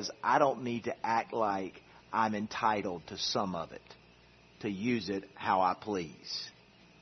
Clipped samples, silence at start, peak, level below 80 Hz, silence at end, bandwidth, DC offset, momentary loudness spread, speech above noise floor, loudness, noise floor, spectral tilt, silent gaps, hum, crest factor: under 0.1%; 0 s; -12 dBFS; -70 dBFS; 0.5 s; 6.2 kHz; under 0.1%; 11 LU; 27 dB; -33 LUFS; -60 dBFS; -3 dB/octave; none; none; 22 dB